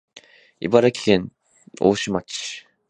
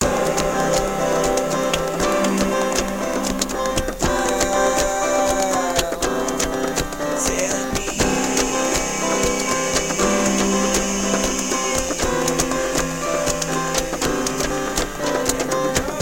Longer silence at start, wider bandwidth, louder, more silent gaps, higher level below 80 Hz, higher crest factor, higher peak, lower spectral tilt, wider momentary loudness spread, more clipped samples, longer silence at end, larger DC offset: first, 0.15 s vs 0 s; second, 10.5 kHz vs 17 kHz; about the same, -21 LUFS vs -20 LUFS; neither; second, -56 dBFS vs -34 dBFS; first, 22 dB vs 16 dB; first, 0 dBFS vs -4 dBFS; first, -5 dB/octave vs -3 dB/octave; first, 14 LU vs 4 LU; neither; first, 0.3 s vs 0 s; second, under 0.1% vs 0.8%